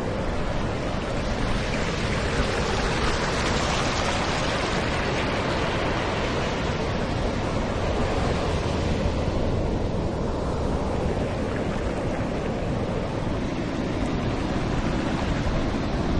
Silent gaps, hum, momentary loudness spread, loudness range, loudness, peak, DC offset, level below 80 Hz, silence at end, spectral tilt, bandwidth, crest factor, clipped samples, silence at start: none; none; 3 LU; 3 LU; -26 LUFS; -12 dBFS; under 0.1%; -32 dBFS; 0 s; -5.5 dB/octave; 10.5 kHz; 14 dB; under 0.1%; 0 s